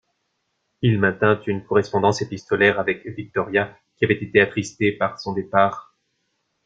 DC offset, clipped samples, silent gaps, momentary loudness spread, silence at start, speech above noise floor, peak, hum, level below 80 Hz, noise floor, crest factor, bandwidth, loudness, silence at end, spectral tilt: under 0.1%; under 0.1%; none; 9 LU; 0.8 s; 53 dB; -2 dBFS; none; -58 dBFS; -73 dBFS; 20 dB; 7.8 kHz; -21 LUFS; 0.85 s; -6 dB/octave